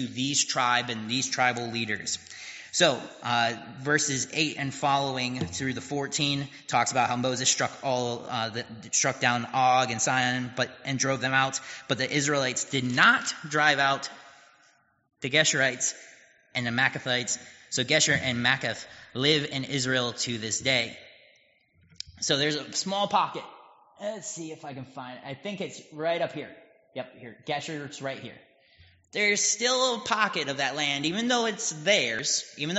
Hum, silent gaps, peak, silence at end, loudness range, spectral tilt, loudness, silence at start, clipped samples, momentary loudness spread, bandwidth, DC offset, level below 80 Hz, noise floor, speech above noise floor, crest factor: none; none; -4 dBFS; 0 s; 9 LU; -2 dB/octave; -26 LUFS; 0 s; under 0.1%; 15 LU; 8 kHz; under 0.1%; -66 dBFS; -64 dBFS; 36 dB; 24 dB